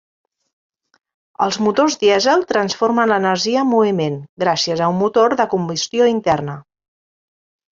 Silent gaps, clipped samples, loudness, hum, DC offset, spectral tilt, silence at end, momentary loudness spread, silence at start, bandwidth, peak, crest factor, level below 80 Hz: 4.29-4.37 s; under 0.1%; -16 LUFS; none; under 0.1%; -4.5 dB/octave; 1.15 s; 6 LU; 1.4 s; 7.6 kHz; -2 dBFS; 16 dB; -58 dBFS